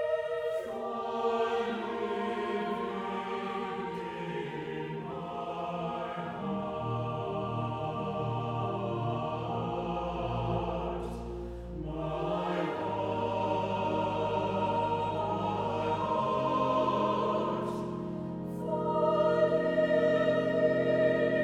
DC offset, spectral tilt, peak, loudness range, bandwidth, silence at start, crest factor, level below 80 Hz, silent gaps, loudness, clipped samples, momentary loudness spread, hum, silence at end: under 0.1%; -7.5 dB/octave; -16 dBFS; 7 LU; 10.5 kHz; 0 s; 16 dB; -52 dBFS; none; -32 LUFS; under 0.1%; 10 LU; none; 0 s